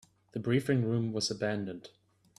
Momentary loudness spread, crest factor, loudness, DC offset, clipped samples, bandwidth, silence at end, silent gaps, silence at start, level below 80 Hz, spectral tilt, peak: 13 LU; 18 dB; -32 LUFS; under 0.1%; under 0.1%; 13.5 kHz; 0.5 s; none; 0.35 s; -70 dBFS; -5.5 dB/octave; -16 dBFS